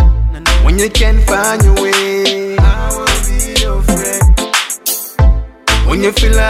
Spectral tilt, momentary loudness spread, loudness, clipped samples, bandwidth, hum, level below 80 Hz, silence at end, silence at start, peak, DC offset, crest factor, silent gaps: -4 dB/octave; 4 LU; -12 LUFS; under 0.1%; 16.5 kHz; none; -12 dBFS; 0 s; 0 s; 0 dBFS; under 0.1%; 10 dB; none